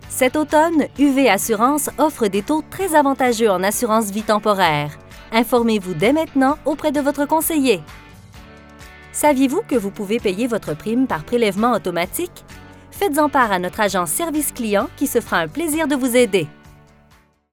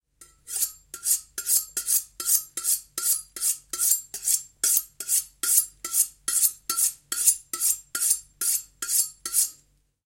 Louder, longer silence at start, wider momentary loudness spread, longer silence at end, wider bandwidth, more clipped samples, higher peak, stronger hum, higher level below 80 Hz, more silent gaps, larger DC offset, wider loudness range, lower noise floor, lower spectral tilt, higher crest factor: first, -18 LUFS vs -23 LUFS; second, 0 s vs 0.2 s; about the same, 6 LU vs 5 LU; first, 1 s vs 0.5 s; first, 19.5 kHz vs 17 kHz; neither; about the same, 0 dBFS vs -2 dBFS; neither; first, -48 dBFS vs -64 dBFS; neither; neither; about the same, 4 LU vs 2 LU; second, -54 dBFS vs -63 dBFS; first, -4 dB/octave vs 3 dB/octave; second, 18 dB vs 24 dB